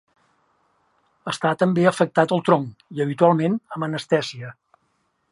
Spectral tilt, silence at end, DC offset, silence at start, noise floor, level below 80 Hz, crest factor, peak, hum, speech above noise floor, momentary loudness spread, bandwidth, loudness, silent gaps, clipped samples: -6.5 dB/octave; 0.8 s; under 0.1%; 1.25 s; -69 dBFS; -68 dBFS; 22 dB; -2 dBFS; none; 49 dB; 14 LU; 11.5 kHz; -21 LUFS; none; under 0.1%